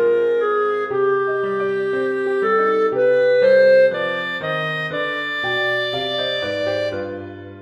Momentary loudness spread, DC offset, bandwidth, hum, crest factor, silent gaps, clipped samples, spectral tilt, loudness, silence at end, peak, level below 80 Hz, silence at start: 9 LU; under 0.1%; 8.2 kHz; none; 12 dB; none; under 0.1%; -5.5 dB/octave; -18 LUFS; 0 s; -6 dBFS; -62 dBFS; 0 s